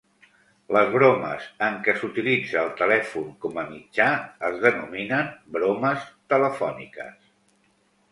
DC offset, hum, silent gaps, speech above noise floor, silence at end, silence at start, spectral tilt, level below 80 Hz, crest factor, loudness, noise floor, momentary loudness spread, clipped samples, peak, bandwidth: under 0.1%; none; none; 41 dB; 1 s; 0.7 s; -6.5 dB/octave; -66 dBFS; 22 dB; -23 LUFS; -65 dBFS; 12 LU; under 0.1%; -2 dBFS; 11.5 kHz